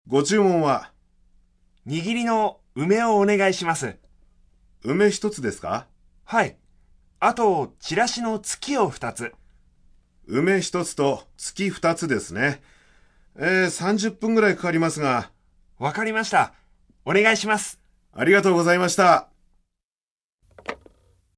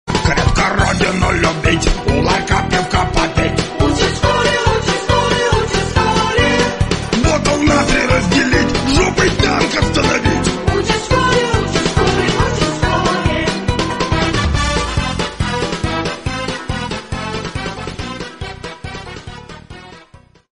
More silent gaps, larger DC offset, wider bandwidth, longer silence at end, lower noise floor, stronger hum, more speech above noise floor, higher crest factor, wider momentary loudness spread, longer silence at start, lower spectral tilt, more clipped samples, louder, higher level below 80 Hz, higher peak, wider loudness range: first, 19.84-20.38 s vs none; second, under 0.1% vs 0.3%; about the same, 11 kHz vs 11 kHz; about the same, 0.6 s vs 0.55 s; first, -83 dBFS vs -44 dBFS; neither; first, 61 dB vs 30 dB; first, 20 dB vs 14 dB; about the same, 13 LU vs 12 LU; about the same, 0.05 s vs 0.05 s; about the same, -4.5 dB/octave vs -4.5 dB/octave; neither; second, -22 LUFS vs -15 LUFS; second, -58 dBFS vs -24 dBFS; second, -4 dBFS vs 0 dBFS; second, 5 LU vs 9 LU